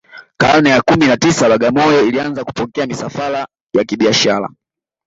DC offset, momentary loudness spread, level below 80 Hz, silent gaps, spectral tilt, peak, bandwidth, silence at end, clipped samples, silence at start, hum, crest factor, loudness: under 0.1%; 10 LU; -46 dBFS; 3.61-3.67 s; -4.5 dB/octave; 0 dBFS; 8 kHz; 0.6 s; under 0.1%; 0.15 s; none; 14 dB; -13 LUFS